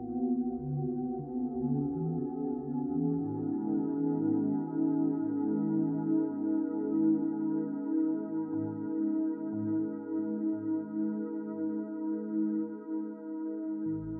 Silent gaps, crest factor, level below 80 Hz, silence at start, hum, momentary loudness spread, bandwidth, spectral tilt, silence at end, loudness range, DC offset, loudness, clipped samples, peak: none; 14 dB; -66 dBFS; 0 s; none; 6 LU; 2 kHz; -9.5 dB/octave; 0 s; 4 LU; under 0.1%; -33 LUFS; under 0.1%; -18 dBFS